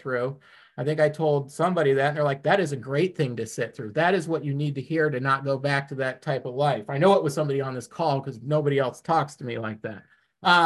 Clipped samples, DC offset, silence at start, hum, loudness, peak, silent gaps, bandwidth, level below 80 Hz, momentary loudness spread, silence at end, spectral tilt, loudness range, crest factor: under 0.1%; under 0.1%; 0.05 s; none; -25 LUFS; -6 dBFS; none; 12.5 kHz; -68 dBFS; 10 LU; 0 s; -6 dB/octave; 1 LU; 20 dB